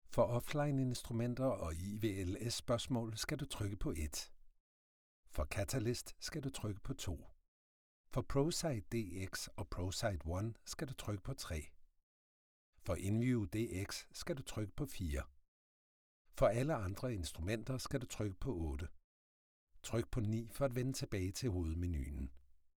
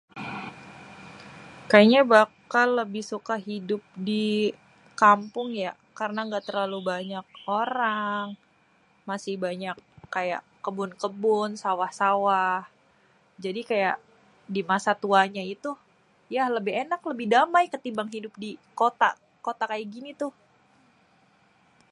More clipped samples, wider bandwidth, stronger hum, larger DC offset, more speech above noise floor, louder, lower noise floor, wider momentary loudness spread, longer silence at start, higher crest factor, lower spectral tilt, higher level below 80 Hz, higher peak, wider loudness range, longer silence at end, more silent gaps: neither; first, 19.5 kHz vs 11.5 kHz; neither; neither; first, over 50 dB vs 38 dB; second, -41 LUFS vs -26 LUFS; first, under -90 dBFS vs -63 dBFS; second, 9 LU vs 18 LU; about the same, 0.05 s vs 0.15 s; second, 20 dB vs 26 dB; about the same, -5.5 dB/octave vs -5 dB/octave; first, -52 dBFS vs -74 dBFS; second, -20 dBFS vs -2 dBFS; second, 4 LU vs 8 LU; second, 0.35 s vs 1.6 s; first, 4.60-5.23 s, 7.48-8.04 s, 12.03-12.73 s, 15.48-16.25 s, 19.04-19.67 s vs none